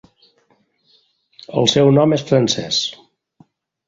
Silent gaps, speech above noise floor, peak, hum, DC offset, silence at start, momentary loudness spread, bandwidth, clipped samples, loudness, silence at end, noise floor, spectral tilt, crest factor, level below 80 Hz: none; 46 dB; -2 dBFS; none; under 0.1%; 1.5 s; 9 LU; 7.8 kHz; under 0.1%; -16 LUFS; 0.95 s; -61 dBFS; -5 dB/octave; 18 dB; -54 dBFS